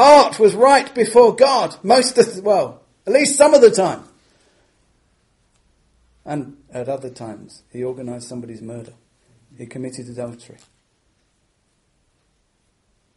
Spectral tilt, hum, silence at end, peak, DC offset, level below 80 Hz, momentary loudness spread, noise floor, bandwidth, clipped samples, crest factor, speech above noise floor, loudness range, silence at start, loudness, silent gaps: -3.5 dB/octave; none; 2.8 s; 0 dBFS; under 0.1%; -60 dBFS; 22 LU; -65 dBFS; 11.5 kHz; under 0.1%; 18 dB; 48 dB; 22 LU; 0 s; -15 LUFS; none